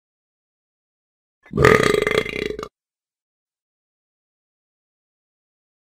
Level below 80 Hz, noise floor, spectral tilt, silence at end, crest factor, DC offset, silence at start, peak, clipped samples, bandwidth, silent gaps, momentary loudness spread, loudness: -44 dBFS; under -90 dBFS; -5 dB/octave; 3.3 s; 24 dB; under 0.1%; 1.55 s; 0 dBFS; under 0.1%; 16 kHz; none; 18 LU; -17 LUFS